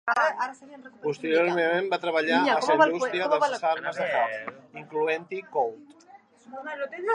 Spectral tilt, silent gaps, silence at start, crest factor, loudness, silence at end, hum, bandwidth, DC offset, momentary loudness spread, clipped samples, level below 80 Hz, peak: -4 dB/octave; none; 0.05 s; 20 dB; -26 LUFS; 0 s; none; 10.5 kHz; under 0.1%; 14 LU; under 0.1%; -82 dBFS; -6 dBFS